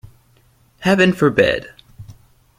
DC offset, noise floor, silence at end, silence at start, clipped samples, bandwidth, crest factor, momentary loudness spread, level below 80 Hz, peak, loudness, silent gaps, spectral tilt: under 0.1%; -55 dBFS; 0.45 s; 0.8 s; under 0.1%; 15 kHz; 18 dB; 9 LU; -48 dBFS; 0 dBFS; -16 LUFS; none; -6 dB/octave